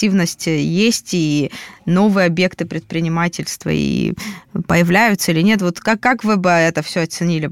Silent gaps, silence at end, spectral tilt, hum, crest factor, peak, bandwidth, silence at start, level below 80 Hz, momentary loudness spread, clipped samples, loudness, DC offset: none; 0 s; -5 dB/octave; none; 14 dB; -2 dBFS; 16 kHz; 0 s; -46 dBFS; 9 LU; under 0.1%; -16 LUFS; 0.1%